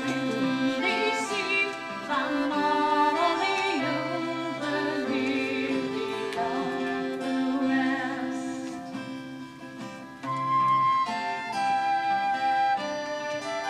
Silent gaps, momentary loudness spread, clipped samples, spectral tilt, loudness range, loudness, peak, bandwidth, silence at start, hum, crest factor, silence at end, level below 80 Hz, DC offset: none; 12 LU; under 0.1%; -4.5 dB/octave; 4 LU; -27 LUFS; -12 dBFS; 13 kHz; 0 s; none; 16 dB; 0 s; -68 dBFS; under 0.1%